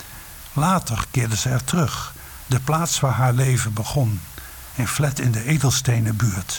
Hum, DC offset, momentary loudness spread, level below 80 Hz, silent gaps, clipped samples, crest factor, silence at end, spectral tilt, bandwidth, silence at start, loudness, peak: none; under 0.1%; 14 LU; -42 dBFS; none; under 0.1%; 14 dB; 0 s; -4.5 dB/octave; 19.5 kHz; 0 s; -21 LUFS; -8 dBFS